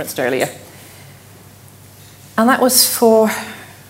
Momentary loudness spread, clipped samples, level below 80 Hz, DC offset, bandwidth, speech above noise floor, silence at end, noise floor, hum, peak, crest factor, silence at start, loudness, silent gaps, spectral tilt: 15 LU; under 0.1%; -60 dBFS; under 0.1%; 16.5 kHz; 27 dB; 0.2 s; -42 dBFS; none; 0 dBFS; 18 dB; 0 s; -14 LUFS; none; -2.5 dB/octave